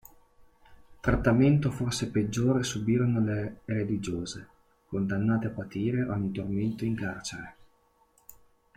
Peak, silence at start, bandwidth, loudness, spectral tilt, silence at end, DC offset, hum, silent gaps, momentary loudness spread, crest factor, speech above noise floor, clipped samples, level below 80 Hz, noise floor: -12 dBFS; 0.4 s; 16 kHz; -29 LUFS; -6.5 dB/octave; 1.25 s; under 0.1%; none; none; 12 LU; 18 dB; 38 dB; under 0.1%; -48 dBFS; -66 dBFS